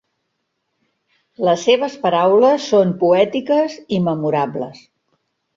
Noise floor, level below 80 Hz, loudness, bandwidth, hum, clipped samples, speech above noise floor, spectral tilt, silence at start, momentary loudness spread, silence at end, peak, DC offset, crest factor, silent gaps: -73 dBFS; -62 dBFS; -16 LUFS; 7.6 kHz; none; under 0.1%; 57 dB; -6 dB/octave; 1.4 s; 8 LU; 0.85 s; -2 dBFS; under 0.1%; 16 dB; none